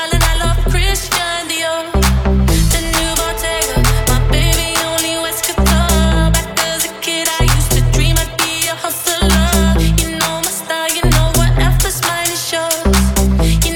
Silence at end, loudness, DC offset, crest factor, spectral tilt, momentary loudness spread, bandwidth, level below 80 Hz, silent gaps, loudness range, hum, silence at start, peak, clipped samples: 0 s; -14 LUFS; under 0.1%; 12 dB; -3.5 dB/octave; 4 LU; 19 kHz; -18 dBFS; none; 1 LU; none; 0 s; 0 dBFS; under 0.1%